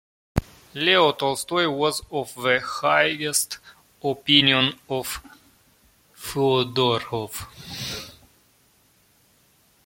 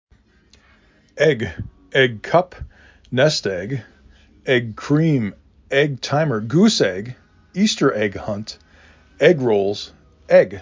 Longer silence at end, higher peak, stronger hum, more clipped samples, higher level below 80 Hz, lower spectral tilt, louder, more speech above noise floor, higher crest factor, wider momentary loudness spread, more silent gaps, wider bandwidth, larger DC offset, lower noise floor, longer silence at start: first, 1.75 s vs 0 s; about the same, -2 dBFS vs -2 dBFS; neither; neither; about the same, -48 dBFS vs -48 dBFS; second, -3 dB/octave vs -5.5 dB/octave; second, -22 LUFS vs -19 LUFS; about the same, 38 dB vs 36 dB; first, 24 dB vs 18 dB; about the same, 17 LU vs 16 LU; neither; first, 17 kHz vs 7.6 kHz; neither; first, -61 dBFS vs -54 dBFS; second, 0.35 s vs 1.15 s